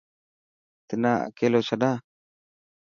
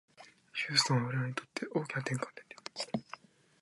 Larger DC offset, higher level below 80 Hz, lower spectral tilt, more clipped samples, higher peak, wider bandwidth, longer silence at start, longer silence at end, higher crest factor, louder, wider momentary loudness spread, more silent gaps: neither; first, -70 dBFS vs -76 dBFS; first, -6.5 dB/octave vs -4 dB/octave; neither; first, -8 dBFS vs -12 dBFS; second, 7.2 kHz vs 11.5 kHz; first, 0.9 s vs 0.2 s; first, 0.9 s vs 0.45 s; about the same, 20 dB vs 24 dB; first, -25 LUFS vs -34 LUFS; second, 9 LU vs 17 LU; neither